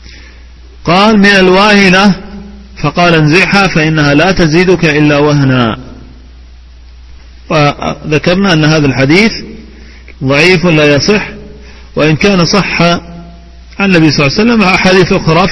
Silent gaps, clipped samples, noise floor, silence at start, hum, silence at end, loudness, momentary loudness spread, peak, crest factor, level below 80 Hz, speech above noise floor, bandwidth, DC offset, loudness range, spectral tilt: none; 1%; -32 dBFS; 0.05 s; none; 0 s; -7 LUFS; 11 LU; 0 dBFS; 8 dB; -30 dBFS; 26 dB; 11 kHz; under 0.1%; 5 LU; -5.5 dB/octave